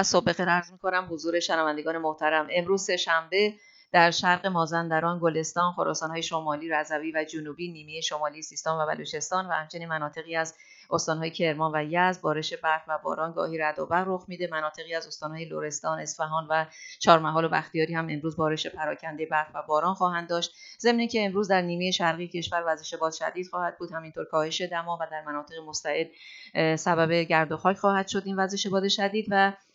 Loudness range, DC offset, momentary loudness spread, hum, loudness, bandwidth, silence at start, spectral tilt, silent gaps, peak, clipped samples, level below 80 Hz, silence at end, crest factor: 6 LU; under 0.1%; 9 LU; none; -27 LUFS; 8 kHz; 0 s; -4 dB/octave; none; -2 dBFS; under 0.1%; -70 dBFS; 0.2 s; 26 dB